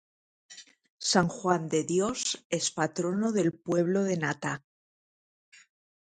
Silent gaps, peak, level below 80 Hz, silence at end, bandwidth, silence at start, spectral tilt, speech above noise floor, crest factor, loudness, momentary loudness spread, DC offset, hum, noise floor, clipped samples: 0.90-0.98 s, 2.45-2.50 s; -8 dBFS; -68 dBFS; 1.45 s; 9.6 kHz; 0.5 s; -4 dB/octave; over 62 dB; 22 dB; -29 LUFS; 9 LU; under 0.1%; none; under -90 dBFS; under 0.1%